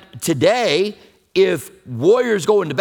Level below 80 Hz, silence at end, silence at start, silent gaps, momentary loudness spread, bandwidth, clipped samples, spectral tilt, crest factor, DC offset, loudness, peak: -60 dBFS; 0 s; 0.15 s; none; 9 LU; 18.5 kHz; under 0.1%; -4.5 dB/octave; 16 dB; under 0.1%; -17 LUFS; 0 dBFS